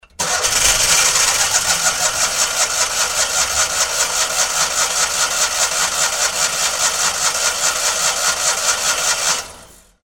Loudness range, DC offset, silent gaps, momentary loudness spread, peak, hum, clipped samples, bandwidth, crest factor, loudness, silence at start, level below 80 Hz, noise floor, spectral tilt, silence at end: 2 LU; under 0.1%; none; 3 LU; 0 dBFS; none; under 0.1%; 18 kHz; 18 dB; -15 LUFS; 0.2 s; -44 dBFS; -43 dBFS; 1.5 dB/octave; 0.4 s